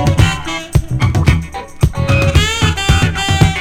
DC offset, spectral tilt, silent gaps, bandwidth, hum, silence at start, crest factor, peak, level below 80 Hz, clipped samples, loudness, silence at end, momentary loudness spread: under 0.1%; -5 dB/octave; none; 16.5 kHz; none; 0 s; 12 dB; 0 dBFS; -20 dBFS; under 0.1%; -14 LUFS; 0 s; 5 LU